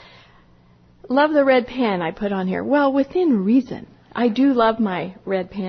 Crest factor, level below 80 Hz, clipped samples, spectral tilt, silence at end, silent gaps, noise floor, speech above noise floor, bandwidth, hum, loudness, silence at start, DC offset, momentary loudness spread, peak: 16 dB; -54 dBFS; under 0.1%; -8 dB/octave; 0 s; none; -52 dBFS; 33 dB; 6.2 kHz; none; -19 LUFS; 1.05 s; under 0.1%; 9 LU; -4 dBFS